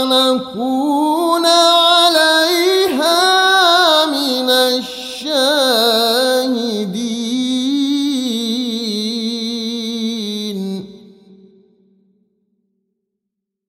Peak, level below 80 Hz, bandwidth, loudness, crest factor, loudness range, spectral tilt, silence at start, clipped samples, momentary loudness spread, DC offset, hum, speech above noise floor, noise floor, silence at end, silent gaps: 0 dBFS; -60 dBFS; 16 kHz; -14 LUFS; 14 dB; 14 LU; -2.5 dB/octave; 0 s; under 0.1%; 11 LU; under 0.1%; none; 64 dB; -79 dBFS; 2.7 s; none